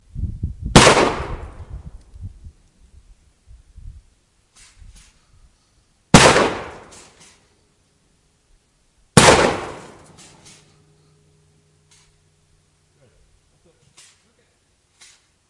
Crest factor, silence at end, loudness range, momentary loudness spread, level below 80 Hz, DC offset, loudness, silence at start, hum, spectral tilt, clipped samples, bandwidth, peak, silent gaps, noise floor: 22 dB; 5.7 s; 4 LU; 29 LU; -36 dBFS; under 0.1%; -14 LUFS; 0.15 s; none; -3.5 dB/octave; under 0.1%; 12 kHz; 0 dBFS; none; -62 dBFS